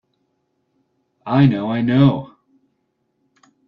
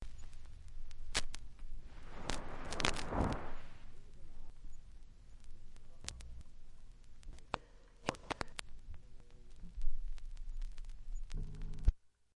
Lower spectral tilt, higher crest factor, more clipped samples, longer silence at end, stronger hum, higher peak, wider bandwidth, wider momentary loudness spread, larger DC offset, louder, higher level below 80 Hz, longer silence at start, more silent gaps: first, -10 dB/octave vs -4 dB/octave; second, 18 dB vs 26 dB; neither; first, 1.4 s vs 0.3 s; neither; first, -2 dBFS vs -12 dBFS; second, 5.2 kHz vs 11.5 kHz; second, 20 LU vs 23 LU; neither; first, -17 LUFS vs -44 LUFS; second, -56 dBFS vs -44 dBFS; first, 1.25 s vs 0 s; neither